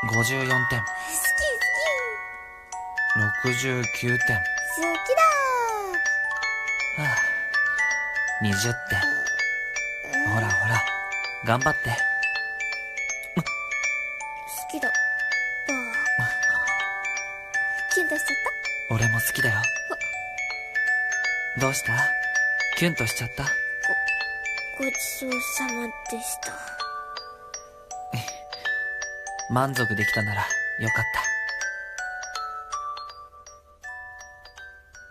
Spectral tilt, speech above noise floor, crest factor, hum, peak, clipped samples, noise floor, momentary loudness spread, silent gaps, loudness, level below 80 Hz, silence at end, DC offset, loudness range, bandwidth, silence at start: -3.5 dB/octave; 24 dB; 20 dB; none; -8 dBFS; under 0.1%; -49 dBFS; 11 LU; none; -24 LUFS; -54 dBFS; 0 s; under 0.1%; 7 LU; 14 kHz; 0 s